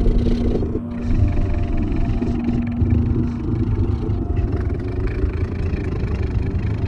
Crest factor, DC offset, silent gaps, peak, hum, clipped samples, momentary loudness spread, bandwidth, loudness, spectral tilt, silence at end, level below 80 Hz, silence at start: 14 dB; under 0.1%; none; -4 dBFS; none; under 0.1%; 4 LU; 6.6 kHz; -22 LUFS; -9.5 dB/octave; 0 s; -22 dBFS; 0 s